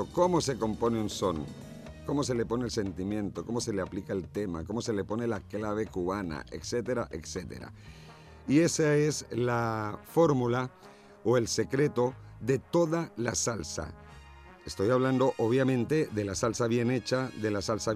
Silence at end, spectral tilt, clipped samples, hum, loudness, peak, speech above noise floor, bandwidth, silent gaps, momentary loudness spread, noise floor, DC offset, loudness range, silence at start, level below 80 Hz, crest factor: 0 s; -5.5 dB/octave; under 0.1%; none; -30 LUFS; -14 dBFS; 21 dB; 15 kHz; none; 13 LU; -51 dBFS; under 0.1%; 5 LU; 0 s; -54 dBFS; 16 dB